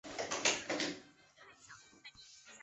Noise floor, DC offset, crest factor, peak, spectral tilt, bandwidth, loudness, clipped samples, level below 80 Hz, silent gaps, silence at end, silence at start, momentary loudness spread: -62 dBFS; under 0.1%; 24 dB; -18 dBFS; -1 dB/octave; 8.2 kHz; -36 LUFS; under 0.1%; -76 dBFS; none; 0 s; 0.05 s; 23 LU